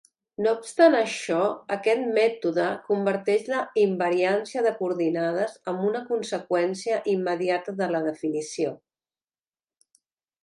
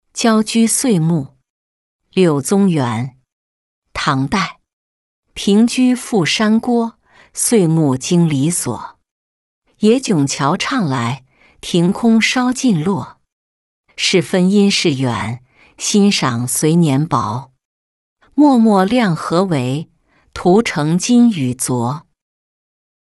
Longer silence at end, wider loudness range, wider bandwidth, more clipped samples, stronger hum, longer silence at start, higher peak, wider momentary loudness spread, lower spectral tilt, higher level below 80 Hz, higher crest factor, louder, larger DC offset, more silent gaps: first, 1.65 s vs 1.1 s; about the same, 5 LU vs 3 LU; about the same, 11.5 kHz vs 12 kHz; neither; neither; first, 0.4 s vs 0.15 s; second, -6 dBFS vs -2 dBFS; second, 6 LU vs 12 LU; about the same, -5 dB/octave vs -5 dB/octave; second, -78 dBFS vs -52 dBFS; first, 20 dB vs 14 dB; second, -25 LUFS vs -15 LUFS; neither; second, none vs 1.50-1.99 s, 3.32-3.82 s, 4.73-5.23 s, 9.11-9.62 s, 13.32-13.84 s, 17.65-18.16 s